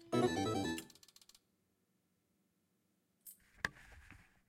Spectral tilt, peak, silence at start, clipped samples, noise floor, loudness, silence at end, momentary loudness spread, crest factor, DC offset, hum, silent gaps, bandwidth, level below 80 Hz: -5 dB/octave; -20 dBFS; 0 s; under 0.1%; -81 dBFS; -39 LUFS; 0.35 s; 25 LU; 24 dB; under 0.1%; none; none; 16.5 kHz; -70 dBFS